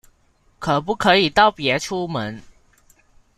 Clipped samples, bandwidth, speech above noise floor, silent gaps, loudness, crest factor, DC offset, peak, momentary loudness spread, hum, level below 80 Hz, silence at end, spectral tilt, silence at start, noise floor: under 0.1%; 15 kHz; 40 dB; none; -19 LUFS; 20 dB; under 0.1%; -2 dBFS; 14 LU; none; -50 dBFS; 1 s; -4.5 dB/octave; 0.6 s; -59 dBFS